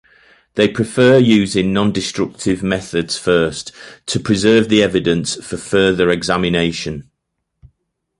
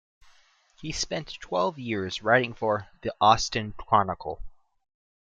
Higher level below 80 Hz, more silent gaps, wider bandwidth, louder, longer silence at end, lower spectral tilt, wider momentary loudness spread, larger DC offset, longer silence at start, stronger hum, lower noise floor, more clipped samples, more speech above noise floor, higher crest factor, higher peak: first, -44 dBFS vs -50 dBFS; neither; first, 11.5 kHz vs 9.4 kHz; first, -15 LUFS vs -26 LUFS; first, 1.15 s vs 0.7 s; about the same, -5 dB/octave vs -4 dB/octave; about the same, 13 LU vs 14 LU; neither; second, 0.55 s vs 0.8 s; neither; first, -74 dBFS vs -60 dBFS; neither; first, 59 dB vs 34 dB; second, 16 dB vs 22 dB; first, 0 dBFS vs -4 dBFS